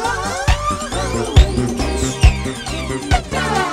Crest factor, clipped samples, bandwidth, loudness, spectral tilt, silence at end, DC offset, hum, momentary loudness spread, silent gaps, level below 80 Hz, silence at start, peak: 16 dB; under 0.1%; 14 kHz; -18 LUFS; -5 dB/octave; 0 s; under 0.1%; none; 9 LU; none; -20 dBFS; 0 s; 0 dBFS